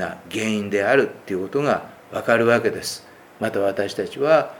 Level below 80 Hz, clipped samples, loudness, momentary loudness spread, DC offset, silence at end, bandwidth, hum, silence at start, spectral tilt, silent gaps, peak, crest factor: -64 dBFS; under 0.1%; -22 LUFS; 11 LU; under 0.1%; 0 s; 18 kHz; none; 0 s; -5 dB/octave; none; -2 dBFS; 20 dB